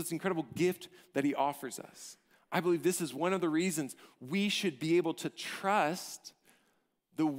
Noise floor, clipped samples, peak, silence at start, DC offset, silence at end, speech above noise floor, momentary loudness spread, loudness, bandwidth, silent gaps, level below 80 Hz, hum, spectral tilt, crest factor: -76 dBFS; under 0.1%; -16 dBFS; 0 s; under 0.1%; 0 s; 42 dB; 16 LU; -33 LUFS; 16 kHz; none; -80 dBFS; none; -4.5 dB/octave; 18 dB